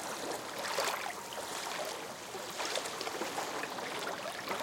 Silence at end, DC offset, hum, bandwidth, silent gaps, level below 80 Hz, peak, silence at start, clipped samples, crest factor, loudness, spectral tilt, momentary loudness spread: 0 s; under 0.1%; none; 17 kHz; none; -76 dBFS; -18 dBFS; 0 s; under 0.1%; 20 dB; -38 LUFS; -1.5 dB/octave; 6 LU